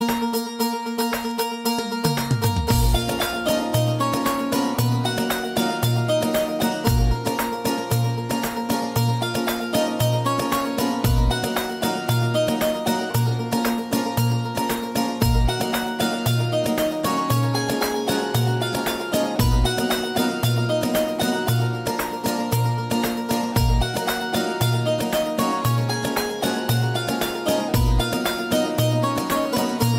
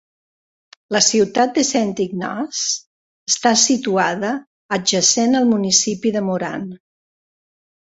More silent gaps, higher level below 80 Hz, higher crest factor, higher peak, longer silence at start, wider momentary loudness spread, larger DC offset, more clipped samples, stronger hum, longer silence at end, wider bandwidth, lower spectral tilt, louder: second, none vs 2.87-3.26 s, 4.47-4.69 s; first, -32 dBFS vs -62 dBFS; about the same, 16 dB vs 20 dB; second, -4 dBFS vs 0 dBFS; second, 0 s vs 0.9 s; second, 3 LU vs 11 LU; neither; neither; neither; second, 0 s vs 1.15 s; first, 16.5 kHz vs 8.2 kHz; first, -5 dB/octave vs -2.5 dB/octave; second, -22 LUFS vs -17 LUFS